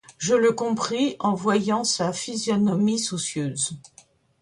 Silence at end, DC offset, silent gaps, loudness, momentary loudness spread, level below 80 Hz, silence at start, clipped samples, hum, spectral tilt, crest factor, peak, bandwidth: 0.55 s; under 0.1%; none; -23 LUFS; 7 LU; -64 dBFS; 0.1 s; under 0.1%; none; -4 dB/octave; 14 dB; -10 dBFS; 11.5 kHz